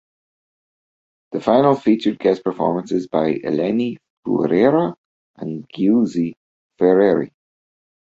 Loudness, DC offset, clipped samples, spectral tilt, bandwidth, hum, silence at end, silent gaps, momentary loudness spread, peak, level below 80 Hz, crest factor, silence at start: -18 LUFS; under 0.1%; under 0.1%; -8 dB/octave; 7.8 kHz; none; 0.85 s; 4.10-4.23 s, 4.98-5.34 s, 6.37-6.70 s; 14 LU; -2 dBFS; -60 dBFS; 18 dB; 1.3 s